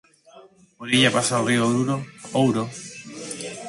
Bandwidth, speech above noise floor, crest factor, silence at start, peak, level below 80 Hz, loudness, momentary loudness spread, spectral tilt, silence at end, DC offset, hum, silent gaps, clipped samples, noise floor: 11.5 kHz; 29 dB; 20 dB; 0.35 s; -4 dBFS; -64 dBFS; -22 LUFS; 18 LU; -4 dB/octave; 0 s; under 0.1%; none; none; under 0.1%; -50 dBFS